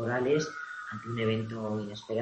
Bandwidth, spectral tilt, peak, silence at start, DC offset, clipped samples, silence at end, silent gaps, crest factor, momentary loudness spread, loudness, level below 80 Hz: 8.6 kHz; -6 dB/octave; -16 dBFS; 0 s; under 0.1%; under 0.1%; 0 s; none; 16 dB; 11 LU; -32 LUFS; -66 dBFS